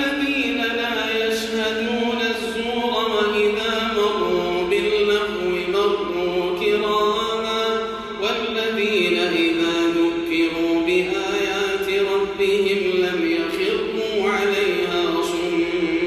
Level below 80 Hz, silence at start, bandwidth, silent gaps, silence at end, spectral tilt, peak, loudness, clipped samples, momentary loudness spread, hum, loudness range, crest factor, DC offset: -50 dBFS; 0 s; 15.5 kHz; none; 0 s; -4 dB/octave; -8 dBFS; -20 LUFS; under 0.1%; 4 LU; none; 1 LU; 12 dB; under 0.1%